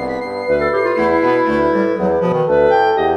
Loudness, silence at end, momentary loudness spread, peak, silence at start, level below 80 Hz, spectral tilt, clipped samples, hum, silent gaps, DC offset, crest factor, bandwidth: -15 LUFS; 0 s; 5 LU; -2 dBFS; 0 s; -42 dBFS; -7.5 dB/octave; under 0.1%; none; none; under 0.1%; 12 dB; 8.8 kHz